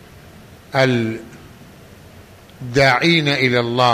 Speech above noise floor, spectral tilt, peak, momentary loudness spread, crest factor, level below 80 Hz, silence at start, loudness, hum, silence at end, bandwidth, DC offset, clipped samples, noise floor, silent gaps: 27 dB; -5.5 dB/octave; -2 dBFS; 12 LU; 16 dB; -48 dBFS; 0.7 s; -16 LUFS; none; 0 s; 15 kHz; under 0.1%; under 0.1%; -42 dBFS; none